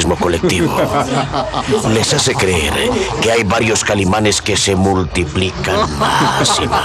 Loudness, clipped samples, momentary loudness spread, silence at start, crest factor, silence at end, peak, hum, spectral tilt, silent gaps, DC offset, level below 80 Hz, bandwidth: -14 LUFS; under 0.1%; 4 LU; 0 s; 12 dB; 0 s; -2 dBFS; none; -4 dB/octave; none; under 0.1%; -34 dBFS; 15.5 kHz